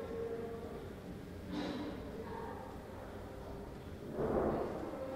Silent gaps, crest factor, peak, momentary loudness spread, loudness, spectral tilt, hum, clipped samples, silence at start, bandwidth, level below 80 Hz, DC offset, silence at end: none; 20 dB; -22 dBFS; 12 LU; -43 LUFS; -7 dB/octave; none; under 0.1%; 0 s; 16 kHz; -56 dBFS; under 0.1%; 0 s